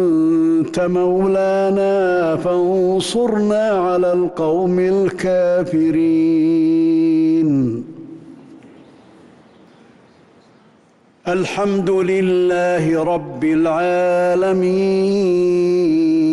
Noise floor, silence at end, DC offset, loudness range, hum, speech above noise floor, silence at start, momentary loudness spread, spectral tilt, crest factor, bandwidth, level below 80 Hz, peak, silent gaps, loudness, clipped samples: -52 dBFS; 0 s; under 0.1%; 8 LU; none; 37 dB; 0 s; 4 LU; -7 dB/octave; 8 dB; 11.5 kHz; -54 dBFS; -8 dBFS; none; -16 LUFS; under 0.1%